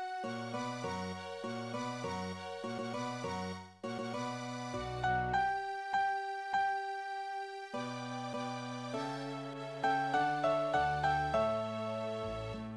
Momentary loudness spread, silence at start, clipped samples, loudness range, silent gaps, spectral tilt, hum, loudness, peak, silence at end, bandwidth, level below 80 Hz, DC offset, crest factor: 10 LU; 0 s; under 0.1%; 6 LU; none; -5 dB/octave; none; -37 LUFS; -20 dBFS; 0 s; 11 kHz; -60 dBFS; under 0.1%; 16 dB